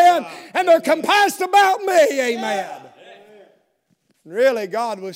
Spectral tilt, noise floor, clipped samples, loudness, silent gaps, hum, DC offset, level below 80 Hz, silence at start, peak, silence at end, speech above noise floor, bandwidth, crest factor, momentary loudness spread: -2.5 dB/octave; -66 dBFS; under 0.1%; -17 LUFS; none; none; under 0.1%; -82 dBFS; 0 s; -4 dBFS; 0 s; 48 dB; 16 kHz; 14 dB; 11 LU